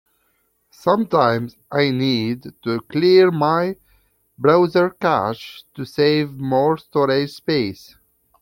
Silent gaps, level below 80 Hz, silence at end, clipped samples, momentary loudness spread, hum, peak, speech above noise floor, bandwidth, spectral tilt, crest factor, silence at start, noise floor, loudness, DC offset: none; -60 dBFS; 0.65 s; under 0.1%; 11 LU; none; -2 dBFS; 47 dB; 16.5 kHz; -7 dB/octave; 18 dB; 0.85 s; -66 dBFS; -19 LUFS; under 0.1%